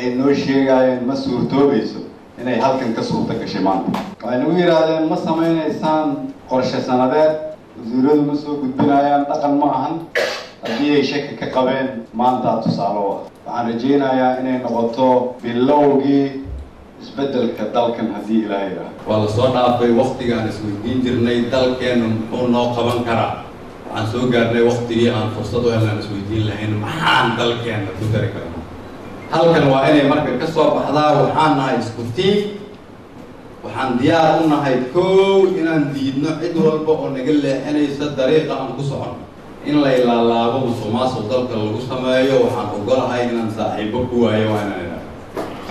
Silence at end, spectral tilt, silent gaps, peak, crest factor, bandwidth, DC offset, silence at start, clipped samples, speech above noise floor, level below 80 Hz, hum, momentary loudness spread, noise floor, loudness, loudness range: 0 s; -6.5 dB/octave; none; -4 dBFS; 12 dB; 13 kHz; under 0.1%; 0 s; under 0.1%; 21 dB; -46 dBFS; none; 13 LU; -38 dBFS; -17 LUFS; 3 LU